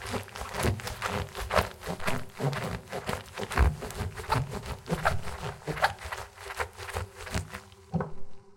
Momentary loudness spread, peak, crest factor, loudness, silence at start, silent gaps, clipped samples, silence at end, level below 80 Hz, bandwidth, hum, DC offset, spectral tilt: 10 LU; -8 dBFS; 24 dB; -33 LUFS; 0 s; none; under 0.1%; 0 s; -40 dBFS; 17 kHz; none; under 0.1%; -5 dB/octave